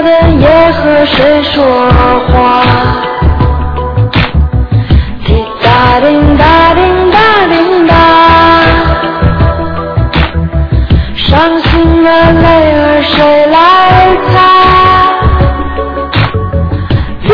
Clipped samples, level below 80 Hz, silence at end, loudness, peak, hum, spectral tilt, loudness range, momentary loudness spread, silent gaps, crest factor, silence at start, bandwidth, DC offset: 3%; -16 dBFS; 0 s; -6 LUFS; 0 dBFS; none; -8 dB/octave; 4 LU; 8 LU; none; 6 dB; 0 s; 5.4 kHz; under 0.1%